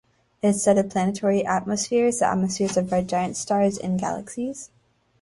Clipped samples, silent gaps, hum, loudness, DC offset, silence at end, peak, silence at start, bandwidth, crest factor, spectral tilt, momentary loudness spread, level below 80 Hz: under 0.1%; none; none; -23 LUFS; under 0.1%; 0.55 s; -6 dBFS; 0.45 s; 11.5 kHz; 16 dB; -5 dB/octave; 10 LU; -56 dBFS